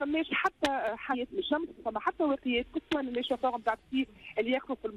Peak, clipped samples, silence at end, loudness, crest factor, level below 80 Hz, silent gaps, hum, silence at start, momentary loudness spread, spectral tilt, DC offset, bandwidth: -18 dBFS; under 0.1%; 0 s; -32 LUFS; 14 dB; -60 dBFS; none; none; 0 s; 5 LU; -4 dB/octave; under 0.1%; 13 kHz